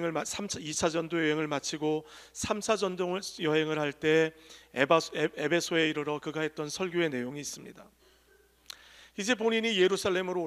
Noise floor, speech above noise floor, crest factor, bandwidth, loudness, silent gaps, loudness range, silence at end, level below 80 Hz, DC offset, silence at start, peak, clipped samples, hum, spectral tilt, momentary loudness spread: -64 dBFS; 34 dB; 22 dB; 15 kHz; -30 LUFS; none; 5 LU; 0 s; -66 dBFS; under 0.1%; 0 s; -8 dBFS; under 0.1%; none; -3.5 dB/octave; 13 LU